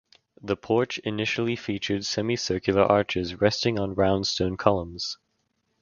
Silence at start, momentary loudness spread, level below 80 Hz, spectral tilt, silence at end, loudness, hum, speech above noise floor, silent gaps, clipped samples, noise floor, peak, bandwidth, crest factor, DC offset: 0.45 s; 10 LU; -50 dBFS; -5 dB/octave; 0.7 s; -25 LUFS; none; 49 dB; none; under 0.1%; -74 dBFS; -2 dBFS; 7.2 kHz; 24 dB; under 0.1%